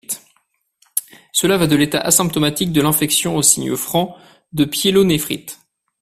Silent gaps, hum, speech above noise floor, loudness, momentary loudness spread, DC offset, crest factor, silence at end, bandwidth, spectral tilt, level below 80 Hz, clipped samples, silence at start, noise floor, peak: none; none; 48 dB; -16 LUFS; 13 LU; under 0.1%; 18 dB; 0.5 s; 16 kHz; -3.5 dB/octave; -48 dBFS; under 0.1%; 0.1 s; -64 dBFS; 0 dBFS